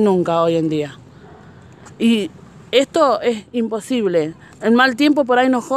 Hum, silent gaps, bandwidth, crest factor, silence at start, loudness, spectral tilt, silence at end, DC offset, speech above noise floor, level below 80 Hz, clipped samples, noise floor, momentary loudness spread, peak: none; none; 14 kHz; 16 dB; 0 s; -17 LUFS; -5.5 dB/octave; 0 s; under 0.1%; 26 dB; -58 dBFS; under 0.1%; -42 dBFS; 9 LU; -2 dBFS